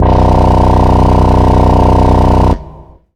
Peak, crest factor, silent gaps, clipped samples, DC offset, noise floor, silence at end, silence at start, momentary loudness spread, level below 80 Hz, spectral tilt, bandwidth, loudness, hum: 0 dBFS; 8 dB; none; 0.5%; under 0.1%; -34 dBFS; 0.35 s; 0 s; 2 LU; -12 dBFS; -8.5 dB/octave; 9.8 kHz; -9 LUFS; none